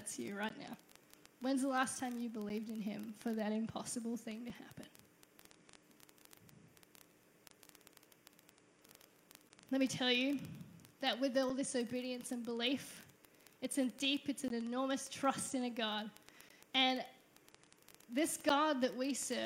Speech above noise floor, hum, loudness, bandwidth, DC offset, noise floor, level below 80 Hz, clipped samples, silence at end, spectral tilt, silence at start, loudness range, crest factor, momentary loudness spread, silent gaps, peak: 29 dB; none; -38 LUFS; 16 kHz; under 0.1%; -67 dBFS; -82 dBFS; under 0.1%; 0 s; -3 dB/octave; 0 s; 8 LU; 22 dB; 19 LU; none; -20 dBFS